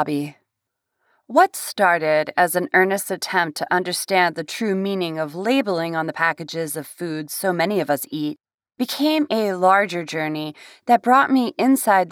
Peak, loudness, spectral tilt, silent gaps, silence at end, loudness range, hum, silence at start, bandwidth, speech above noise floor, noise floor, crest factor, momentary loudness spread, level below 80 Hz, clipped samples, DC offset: -4 dBFS; -20 LUFS; -4 dB/octave; 8.54-8.58 s; 0 s; 4 LU; none; 0 s; 19.5 kHz; 60 dB; -80 dBFS; 18 dB; 11 LU; -76 dBFS; under 0.1%; under 0.1%